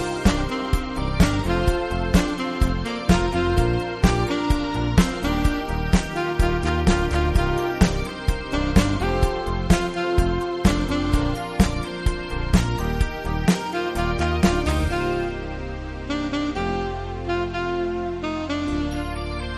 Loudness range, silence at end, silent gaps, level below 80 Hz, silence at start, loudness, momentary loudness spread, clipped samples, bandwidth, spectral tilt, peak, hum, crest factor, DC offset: 4 LU; 0 s; none; -26 dBFS; 0 s; -23 LUFS; 6 LU; under 0.1%; 13.5 kHz; -6 dB/octave; -2 dBFS; none; 20 dB; under 0.1%